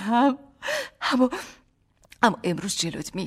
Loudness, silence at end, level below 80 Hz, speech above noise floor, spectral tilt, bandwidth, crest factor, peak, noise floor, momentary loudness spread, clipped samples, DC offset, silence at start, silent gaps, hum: -25 LUFS; 0 s; -60 dBFS; 38 dB; -4 dB/octave; 15.5 kHz; 20 dB; -6 dBFS; -62 dBFS; 10 LU; under 0.1%; under 0.1%; 0 s; none; none